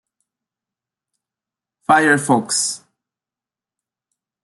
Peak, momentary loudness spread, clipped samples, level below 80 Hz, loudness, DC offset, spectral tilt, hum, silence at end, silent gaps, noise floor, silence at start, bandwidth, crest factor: -2 dBFS; 16 LU; under 0.1%; -70 dBFS; -16 LUFS; under 0.1%; -3 dB/octave; none; 1.65 s; none; -90 dBFS; 1.9 s; 12.5 kHz; 20 dB